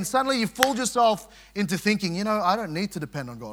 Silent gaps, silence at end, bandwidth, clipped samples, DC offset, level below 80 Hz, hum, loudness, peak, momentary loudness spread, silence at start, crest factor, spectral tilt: none; 0 s; 18 kHz; under 0.1%; under 0.1%; -58 dBFS; none; -25 LUFS; 0 dBFS; 11 LU; 0 s; 26 dB; -4 dB/octave